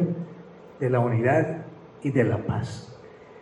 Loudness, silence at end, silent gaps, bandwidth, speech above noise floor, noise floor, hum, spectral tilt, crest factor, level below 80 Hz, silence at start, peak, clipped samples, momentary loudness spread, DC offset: -25 LUFS; 0 s; none; 10 kHz; 21 dB; -45 dBFS; none; -8.5 dB/octave; 18 dB; -60 dBFS; 0 s; -8 dBFS; under 0.1%; 23 LU; under 0.1%